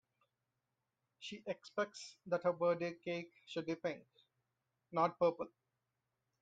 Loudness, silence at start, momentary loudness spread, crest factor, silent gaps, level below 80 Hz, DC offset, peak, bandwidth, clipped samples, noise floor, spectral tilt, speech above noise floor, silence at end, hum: -40 LUFS; 1.2 s; 14 LU; 20 dB; none; -86 dBFS; under 0.1%; -22 dBFS; 9 kHz; under 0.1%; -89 dBFS; -5.5 dB/octave; 49 dB; 0.95 s; none